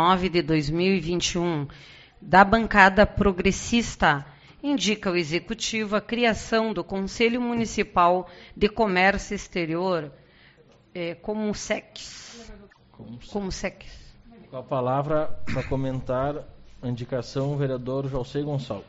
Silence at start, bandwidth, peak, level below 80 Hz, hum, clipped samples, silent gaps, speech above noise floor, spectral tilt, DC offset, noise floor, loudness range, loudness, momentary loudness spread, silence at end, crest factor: 0 s; 8 kHz; 0 dBFS; -44 dBFS; none; under 0.1%; none; 31 dB; -4 dB/octave; under 0.1%; -55 dBFS; 12 LU; -24 LUFS; 14 LU; 0.05 s; 24 dB